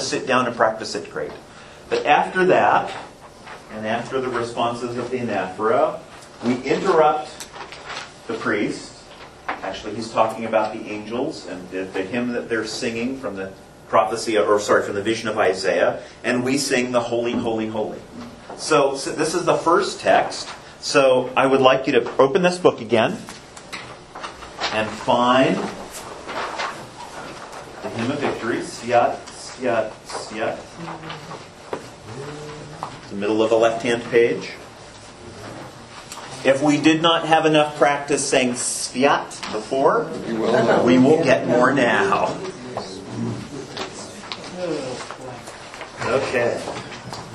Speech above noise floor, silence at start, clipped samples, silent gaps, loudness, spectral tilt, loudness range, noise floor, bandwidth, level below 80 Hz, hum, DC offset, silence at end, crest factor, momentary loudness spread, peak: 22 dB; 0 s; under 0.1%; none; -20 LUFS; -4 dB/octave; 8 LU; -42 dBFS; 12.5 kHz; -56 dBFS; none; under 0.1%; 0 s; 22 dB; 19 LU; 0 dBFS